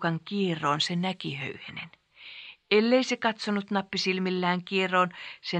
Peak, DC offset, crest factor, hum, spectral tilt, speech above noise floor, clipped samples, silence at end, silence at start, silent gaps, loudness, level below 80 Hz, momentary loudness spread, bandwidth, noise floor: -8 dBFS; under 0.1%; 20 dB; none; -5 dB/octave; 19 dB; under 0.1%; 0 s; 0 s; none; -27 LUFS; -74 dBFS; 17 LU; 9.2 kHz; -47 dBFS